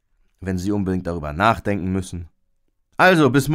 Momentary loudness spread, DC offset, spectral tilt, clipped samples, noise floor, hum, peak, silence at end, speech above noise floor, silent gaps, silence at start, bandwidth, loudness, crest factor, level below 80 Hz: 19 LU; under 0.1%; -6 dB/octave; under 0.1%; -65 dBFS; none; -4 dBFS; 0 s; 46 dB; none; 0.4 s; 16 kHz; -19 LUFS; 18 dB; -42 dBFS